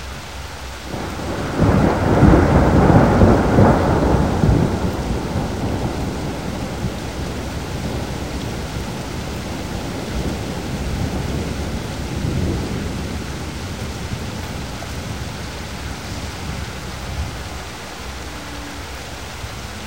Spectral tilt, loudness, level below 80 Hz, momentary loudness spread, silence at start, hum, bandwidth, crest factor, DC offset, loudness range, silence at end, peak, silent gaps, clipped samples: -6.5 dB/octave; -21 LUFS; -28 dBFS; 16 LU; 0 s; none; 16 kHz; 20 dB; 0.7%; 14 LU; 0 s; 0 dBFS; none; under 0.1%